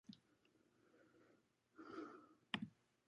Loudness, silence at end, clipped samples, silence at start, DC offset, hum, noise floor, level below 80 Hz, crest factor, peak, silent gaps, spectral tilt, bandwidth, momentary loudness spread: -52 LUFS; 0.35 s; under 0.1%; 0.1 s; under 0.1%; none; -78 dBFS; -90 dBFS; 34 dB; -24 dBFS; none; -5 dB/octave; 10 kHz; 16 LU